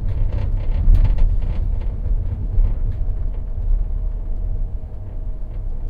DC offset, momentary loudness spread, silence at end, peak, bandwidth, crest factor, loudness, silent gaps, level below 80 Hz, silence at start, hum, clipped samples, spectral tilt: under 0.1%; 12 LU; 0 s; -4 dBFS; 2.9 kHz; 14 dB; -25 LUFS; none; -18 dBFS; 0 s; none; under 0.1%; -10 dB/octave